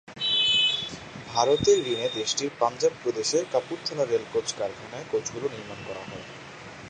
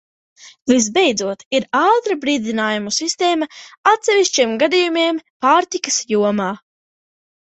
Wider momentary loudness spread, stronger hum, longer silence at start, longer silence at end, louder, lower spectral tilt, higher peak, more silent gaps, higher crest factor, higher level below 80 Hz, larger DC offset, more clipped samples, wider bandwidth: first, 18 LU vs 7 LU; neither; second, 0.05 s vs 0.45 s; second, 0 s vs 0.95 s; second, -25 LUFS vs -17 LUFS; about the same, -2.5 dB/octave vs -2.5 dB/octave; second, -8 dBFS vs 0 dBFS; second, none vs 1.45-1.51 s, 3.77-3.84 s, 5.30-5.40 s; about the same, 20 dB vs 16 dB; about the same, -58 dBFS vs -62 dBFS; neither; neither; first, 10 kHz vs 8.4 kHz